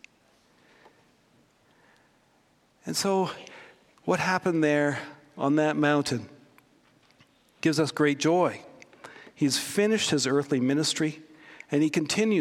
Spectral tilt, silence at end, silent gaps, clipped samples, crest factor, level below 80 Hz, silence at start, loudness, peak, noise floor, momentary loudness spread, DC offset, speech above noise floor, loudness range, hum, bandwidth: -4.5 dB/octave; 0 s; none; under 0.1%; 18 dB; -72 dBFS; 2.85 s; -26 LUFS; -10 dBFS; -65 dBFS; 20 LU; under 0.1%; 40 dB; 8 LU; none; 16 kHz